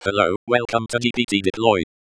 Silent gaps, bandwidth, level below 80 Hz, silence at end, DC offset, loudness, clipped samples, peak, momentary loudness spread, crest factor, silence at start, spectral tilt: 0.36-0.47 s; 11 kHz; -52 dBFS; 0.25 s; under 0.1%; -20 LUFS; under 0.1%; -2 dBFS; 3 LU; 20 dB; 0 s; -4.5 dB/octave